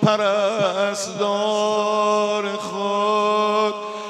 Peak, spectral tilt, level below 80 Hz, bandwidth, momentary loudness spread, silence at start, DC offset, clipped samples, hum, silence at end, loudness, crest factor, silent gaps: -4 dBFS; -4 dB/octave; -78 dBFS; 12.5 kHz; 5 LU; 0 s; under 0.1%; under 0.1%; none; 0 s; -20 LUFS; 16 dB; none